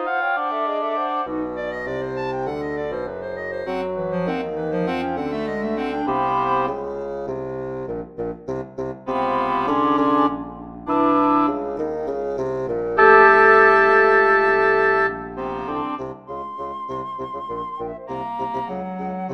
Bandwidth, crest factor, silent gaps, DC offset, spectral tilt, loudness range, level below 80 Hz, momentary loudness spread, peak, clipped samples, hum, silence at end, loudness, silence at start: 6.8 kHz; 20 dB; none; 0.2%; -7 dB/octave; 11 LU; -52 dBFS; 16 LU; 0 dBFS; under 0.1%; none; 0 s; -20 LUFS; 0 s